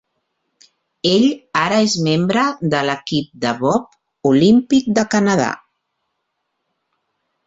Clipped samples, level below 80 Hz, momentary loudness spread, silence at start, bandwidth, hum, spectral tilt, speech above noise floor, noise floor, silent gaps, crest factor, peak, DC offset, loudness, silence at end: under 0.1%; -56 dBFS; 9 LU; 1.05 s; 8 kHz; none; -5 dB/octave; 58 dB; -73 dBFS; none; 16 dB; -2 dBFS; under 0.1%; -16 LUFS; 1.9 s